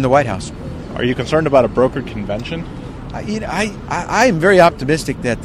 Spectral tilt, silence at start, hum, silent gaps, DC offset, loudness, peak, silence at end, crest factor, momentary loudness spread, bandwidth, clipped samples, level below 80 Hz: -5.5 dB/octave; 0 s; none; none; under 0.1%; -16 LUFS; 0 dBFS; 0 s; 16 dB; 16 LU; 15.5 kHz; under 0.1%; -36 dBFS